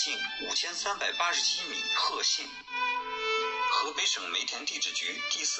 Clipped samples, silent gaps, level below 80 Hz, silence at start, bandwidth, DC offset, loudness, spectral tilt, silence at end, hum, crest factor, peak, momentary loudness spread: under 0.1%; none; -68 dBFS; 0 s; 8.4 kHz; under 0.1%; -29 LUFS; 2 dB/octave; 0 s; none; 16 dB; -16 dBFS; 5 LU